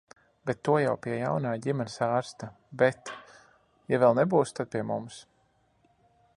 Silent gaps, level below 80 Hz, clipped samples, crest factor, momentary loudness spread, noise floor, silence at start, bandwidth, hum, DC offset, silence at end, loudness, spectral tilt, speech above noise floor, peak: none; -68 dBFS; under 0.1%; 22 dB; 19 LU; -68 dBFS; 0.45 s; 11.5 kHz; none; under 0.1%; 1.15 s; -28 LUFS; -6.5 dB/octave; 41 dB; -8 dBFS